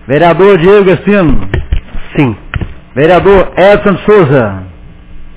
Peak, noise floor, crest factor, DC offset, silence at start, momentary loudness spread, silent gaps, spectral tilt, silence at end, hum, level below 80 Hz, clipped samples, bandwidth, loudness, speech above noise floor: 0 dBFS; -28 dBFS; 8 dB; under 0.1%; 0.1 s; 14 LU; none; -11 dB/octave; 0.1 s; none; -22 dBFS; 3%; 4 kHz; -7 LUFS; 23 dB